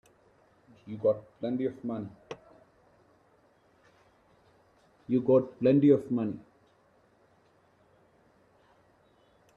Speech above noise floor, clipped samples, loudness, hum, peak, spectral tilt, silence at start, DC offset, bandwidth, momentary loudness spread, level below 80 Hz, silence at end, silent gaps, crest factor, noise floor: 38 dB; under 0.1%; -28 LUFS; none; -10 dBFS; -10 dB/octave; 0.85 s; under 0.1%; 6.4 kHz; 23 LU; -72 dBFS; 3.15 s; none; 22 dB; -65 dBFS